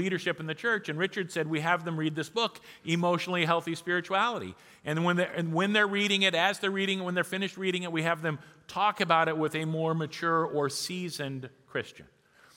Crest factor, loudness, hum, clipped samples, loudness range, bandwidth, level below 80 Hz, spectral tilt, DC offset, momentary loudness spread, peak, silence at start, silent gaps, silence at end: 22 dB; -29 LUFS; none; under 0.1%; 3 LU; 16.5 kHz; -76 dBFS; -4.5 dB/octave; under 0.1%; 12 LU; -8 dBFS; 0 s; none; 0.55 s